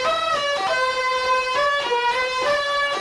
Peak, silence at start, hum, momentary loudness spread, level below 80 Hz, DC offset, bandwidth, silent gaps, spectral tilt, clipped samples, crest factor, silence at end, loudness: -10 dBFS; 0 s; none; 1 LU; -54 dBFS; under 0.1%; 13.5 kHz; none; -1 dB/octave; under 0.1%; 10 dB; 0 s; -20 LUFS